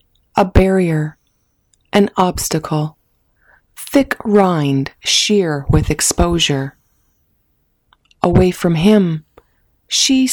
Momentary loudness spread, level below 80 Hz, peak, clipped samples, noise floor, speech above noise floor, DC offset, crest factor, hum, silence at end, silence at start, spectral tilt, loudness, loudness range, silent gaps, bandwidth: 9 LU; -30 dBFS; -2 dBFS; under 0.1%; -63 dBFS; 49 dB; under 0.1%; 14 dB; none; 0 s; 0.35 s; -4.5 dB/octave; -15 LUFS; 3 LU; none; over 20 kHz